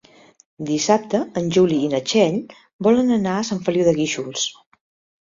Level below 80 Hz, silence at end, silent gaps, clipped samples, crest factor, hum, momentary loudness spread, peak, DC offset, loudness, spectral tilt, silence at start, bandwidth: -58 dBFS; 0.7 s; 2.73-2.79 s; under 0.1%; 18 dB; none; 7 LU; -2 dBFS; under 0.1%; -20 LUFS; -5 dB/octave; 0.6 s; 7.8 kHz